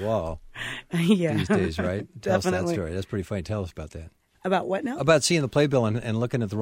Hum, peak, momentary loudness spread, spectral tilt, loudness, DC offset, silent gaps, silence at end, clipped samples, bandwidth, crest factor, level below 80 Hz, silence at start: none; -6 dBFS; 13 LU; -5.5 dB/octave; -25 LUFS; under 0.1%; none; 0 s; under 0.1%; 16 kHz; 20 dB; -48 dBFS; 0 s